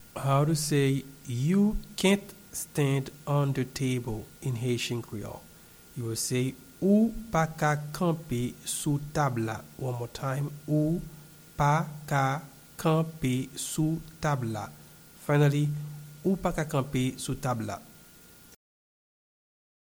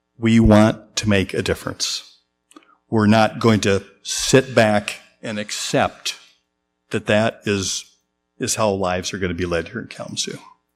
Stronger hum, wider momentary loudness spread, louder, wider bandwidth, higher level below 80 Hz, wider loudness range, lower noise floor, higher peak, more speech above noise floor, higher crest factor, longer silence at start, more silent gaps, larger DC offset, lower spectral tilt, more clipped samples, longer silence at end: neither; about the same, 12 LU vs 13 LU; second, -29 LUFS vs -19 LUFS; first, over 20 kHz vs 15 kHz; second, -50 dBFS vs -38 dBFS; about the same, 4 LU vs 5 LU; second, -53 dBFS vs -73 dBFS; second, -12 dBFS vs 0 dBFS; second, 25 dB vs 54 dB; about the same, 18 dB vs 20 dB; second, 0 s vs 0.2 s; neither; neither; about the same, -5.5 dB/octave vs -4.5 dB/octave; neither; first, 1.95 s vs 0.35 s